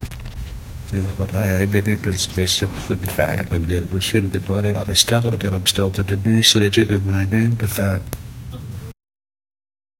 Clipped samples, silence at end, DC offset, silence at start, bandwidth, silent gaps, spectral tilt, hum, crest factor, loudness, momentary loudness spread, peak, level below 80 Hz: under 0.1%; 1.05 s; under 0.1%; 0 s; 17 kHz; none; -4.5 dB/octave; none; 20 dB; -18 LUFS; 18 LU; 0 dBFS; -38 dBFS